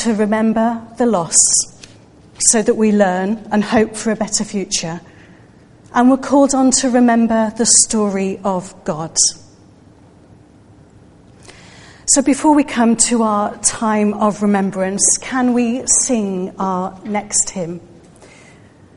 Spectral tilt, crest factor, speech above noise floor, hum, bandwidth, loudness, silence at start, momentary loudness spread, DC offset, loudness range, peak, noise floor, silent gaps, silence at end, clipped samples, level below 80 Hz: -3 dB/octave; 16 dB; 30 dB; none; 11.5 kHz; -15 LUFS; 0 s; 9 LU; under 0.1%; 7 LU; 0 dBFS; -45 dBFS; none; 0.7 s; under 0.1%; -48 dBFS